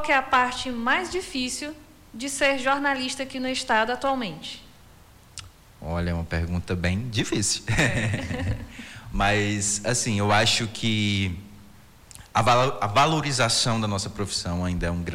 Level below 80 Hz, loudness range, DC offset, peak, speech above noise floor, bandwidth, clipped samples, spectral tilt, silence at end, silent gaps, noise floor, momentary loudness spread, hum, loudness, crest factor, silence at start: -44 dBFS; 5 LU; under 0.1%; -8 dBFS; 27 dB; 16.5 kHz; under 0.1%; -3.5 dB/octave; 0 s; none; -51 dBFS; 14 LU; none; -24 LUFS; 16 dB; 0 s